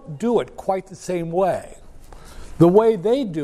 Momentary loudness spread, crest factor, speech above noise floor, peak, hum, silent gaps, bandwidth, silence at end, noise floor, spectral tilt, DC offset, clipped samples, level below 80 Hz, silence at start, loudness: 13 LU; 18 dB; 21 dB; -2 dBFS; none; none; 13 kHz; 0 s; -40 dBFS; -7.5 dB/octave; under 0.1%; under 0.1%; -44 dBFS; 0.05 s; -20 LUFS